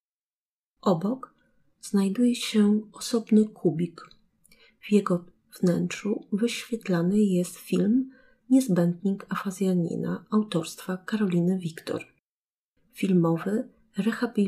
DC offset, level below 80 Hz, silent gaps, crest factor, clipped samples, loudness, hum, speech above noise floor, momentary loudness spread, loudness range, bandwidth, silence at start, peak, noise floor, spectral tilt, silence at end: under 0.1%; -70 dBFS; 12.19-12.74 s; 18 dB; under 0.1%; -26 LUFS; none; over 65 dB; 9 LU; 3 LU; 14.5 kHz; 0.85 s; -10 dBFS; under -90 dBFS; -6.5 dB/octave; 0 s